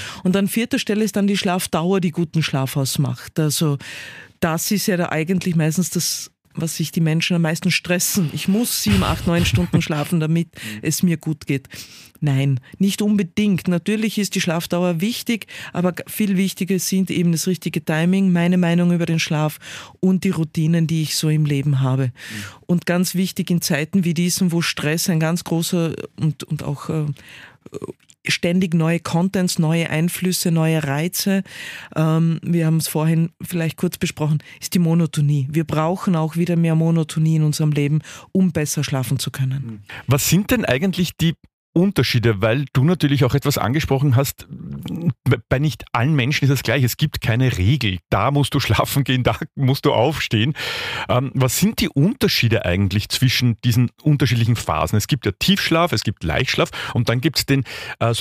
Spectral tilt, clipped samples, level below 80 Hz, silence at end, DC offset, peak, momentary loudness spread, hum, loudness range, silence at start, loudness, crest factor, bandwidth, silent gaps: -5.5 dB/octave; under 0.1%; -44 dBFS; 0 s; under 0.1%; -4 dBFS; 7 LU; none; 3 LU; 0 s; -19 LUFS; 14 dB; 15.5 kHz; 41.53-41.73 s